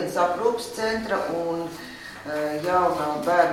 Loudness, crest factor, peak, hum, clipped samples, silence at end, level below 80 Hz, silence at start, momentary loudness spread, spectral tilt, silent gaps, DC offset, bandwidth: -25 LUFS; 18 dB; -6 dBFS; none; under 0.1%; 0 s; -56 dBFS; 0 s; 12 LU; -4.5 dB/octave; none; under 0.1%; 16.5 kHz